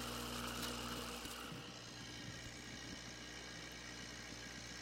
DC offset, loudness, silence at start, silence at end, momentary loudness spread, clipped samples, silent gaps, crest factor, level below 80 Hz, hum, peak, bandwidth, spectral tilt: under 0.1%; -48 LUFS; 0 s; 0 s; 6 LU; under 0.1%; none; 18 dB; -62 dBFS; 60 Hz at -60 dBFS; -30 dBFS; 16 kHz; -3 dB/octave